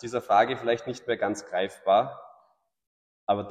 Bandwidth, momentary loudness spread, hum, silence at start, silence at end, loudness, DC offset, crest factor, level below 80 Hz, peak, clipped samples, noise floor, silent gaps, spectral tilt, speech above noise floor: 11.5 kHz; 11 LU; none; 0.05 s; 0 s; -26 LUFS; under 0.1%; 18 dB; -68 dBFS; -10 dBFS; under 0.1%; -65 dBFS; 2.87-3.27 s; -4.5 dB/octave; 39 dB